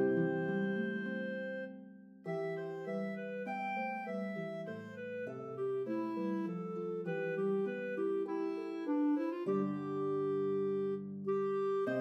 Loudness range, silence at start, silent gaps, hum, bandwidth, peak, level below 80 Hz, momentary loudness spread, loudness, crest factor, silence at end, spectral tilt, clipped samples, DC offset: 5 LU; 0 s; none; none; 6.6 kHz; -22 dBFS; under -90 dBFS; 8 LU; -38 LUFS; 16 dB; 0 s; -8.5 dB/octave; under 0.1%; under 0.1%